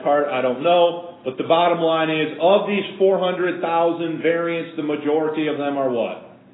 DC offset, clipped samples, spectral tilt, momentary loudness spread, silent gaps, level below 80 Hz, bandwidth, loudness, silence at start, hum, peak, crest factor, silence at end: under 0.1%; under 0.1%; -10.5 dB/octave; 8 LU; none; -72 dBFS; 4 kHz; -20 LUFS; 0 s; none; -4 dBFS; 14 dB; 0.2 s